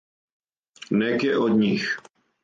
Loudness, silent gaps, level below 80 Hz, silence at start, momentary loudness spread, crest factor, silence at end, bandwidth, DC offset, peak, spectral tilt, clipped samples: -23 LUFS; none; -66 dBFS; 0.9 s; 7 LU; 14 dB; 0.45 s; 7.6 kHz; under 0.1%; -10 dBFS; -6.5 dB/octave; under 0.1%